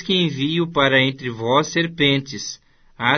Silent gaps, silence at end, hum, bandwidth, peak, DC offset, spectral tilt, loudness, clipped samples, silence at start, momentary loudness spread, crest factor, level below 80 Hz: none; 0 s; none; 6.6 kHz; -2 dBFS; under 0.1%; -4.5 dB/octave; -19 LUFS; under 0.1%; 0 s; 13 LU; 18 dB; -54 dBFS